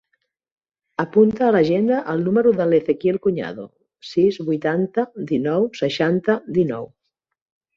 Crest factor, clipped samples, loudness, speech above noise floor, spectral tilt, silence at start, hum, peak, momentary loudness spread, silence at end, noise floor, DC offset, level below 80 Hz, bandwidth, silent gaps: 16 dB; under 0.1%; -20 LUFS; 53 dB; -7.5 dB/octave; 1 s; none; -4 dBFS; 11 LU; 0.9 s; -72 dBFS; under 0.1%; -60 dBFS; 7.4 kHz; none